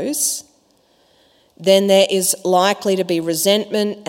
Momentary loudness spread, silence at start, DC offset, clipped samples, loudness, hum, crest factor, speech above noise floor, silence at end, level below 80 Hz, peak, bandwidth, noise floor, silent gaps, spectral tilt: 7 LU; 0 s; under 0.1%; under 0.1%; -16 LUFS; none; 18 dB; 41 dB; 0.05 s; -70 dBFS; 0 dBFS; 16.5 kHz; -57 dBFS; none; -3 dB/octave